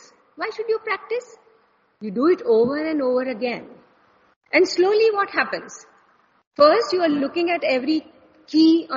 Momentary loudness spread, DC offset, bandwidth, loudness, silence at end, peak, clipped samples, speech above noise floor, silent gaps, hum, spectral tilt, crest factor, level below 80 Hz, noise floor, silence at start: 14 LU; under 0.1%; 7.4 kHz; -20 LUFS; 0 s; -2 dBFS; under 0.1%; 41 dB; 4.36-4.41 s, 6.47-6.51 s; none; -2 dB/octave; 18 dB; -68 dBFS; -61 dBFS; 0.4 s